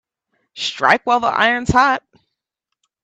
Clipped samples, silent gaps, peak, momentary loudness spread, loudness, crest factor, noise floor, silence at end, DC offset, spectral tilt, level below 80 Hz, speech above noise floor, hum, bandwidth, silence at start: under 0.1%; none; 0 dBFS; 10 LU; -16 LUFS; 18 dB; -79 dBFS; 1.05 s; under 0.1%; -4 dB/octave; -42 dBFS; 64 dB; none; 10.5 kHz; 0.55 s